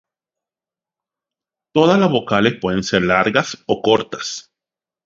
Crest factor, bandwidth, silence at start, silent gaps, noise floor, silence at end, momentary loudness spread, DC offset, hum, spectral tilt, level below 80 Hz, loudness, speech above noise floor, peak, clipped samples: 18 dB; 7.8 kHz; 1.75 s; none; -90 dBFS; 0.65 s; 11 LU; under 0.1%; none; -5 dB/octave; -50 dBFS; -17 LUFS; 73 dB; 0 dBFS; under 0.1%